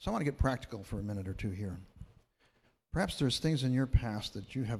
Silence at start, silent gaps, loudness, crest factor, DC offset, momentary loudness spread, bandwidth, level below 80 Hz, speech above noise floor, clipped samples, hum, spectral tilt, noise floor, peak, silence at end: 0 s; none; -35 LUFS; 20 dB; under 0.1%; 11 LU; 14 kHz; -44 dBFS; 38 dB; under 0.1%; none; -6 dB/octave; -71 dBFS; -14 dBFS; 0 s